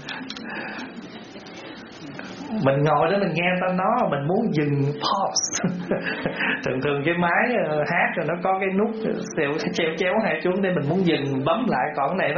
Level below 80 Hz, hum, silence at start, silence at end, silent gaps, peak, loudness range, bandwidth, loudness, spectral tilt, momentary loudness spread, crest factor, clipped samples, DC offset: -58 dBFS; none; 0 s; 0 s; none; -6 dBFS; 2 LU; 7.2 kHz; -23 LUFS; -4.5 dB/octave; 16 LU; 16 dB; under 0.1%; under 0.1%